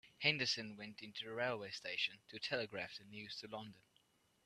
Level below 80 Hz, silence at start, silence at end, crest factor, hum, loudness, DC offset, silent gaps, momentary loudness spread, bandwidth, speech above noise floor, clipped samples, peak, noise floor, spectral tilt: -82 dBFS; 0.05 s; 0.65 s; 26 dB; none; -42 LUFS; under 0.1%; none; 14 LU; 13.5 kHz; 32 dB; under 0.1%; -18 dBFS; -76 dBFS; -3 dB/octave